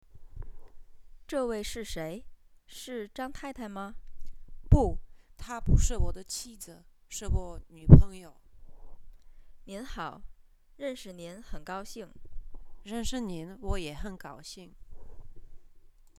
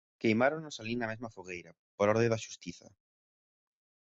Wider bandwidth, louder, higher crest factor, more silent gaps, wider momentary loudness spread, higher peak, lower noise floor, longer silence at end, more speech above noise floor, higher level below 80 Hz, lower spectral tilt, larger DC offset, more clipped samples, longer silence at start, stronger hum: first, 14 kHz vs 8 kHz; about the same, -30 LUFS vs -32 LUFS; first, 30 dB vs 22 dB; second, none vs 1.79-1.98 s; first, 21 LU vs 16 LU; first, 0 dBFS vs -14 dBFS; second, -53 dBFS vs under -90 dBFS; second, 0.4 s vs 1.4 s; second, 25 dB vs over 57 dB; first, -34 dBFS vs -68 dBFS; about the same, -6.5 dB/octave vs -5.5 dB/octave; neither; neither; about the same, 0.15 s vs 0.2 s; neither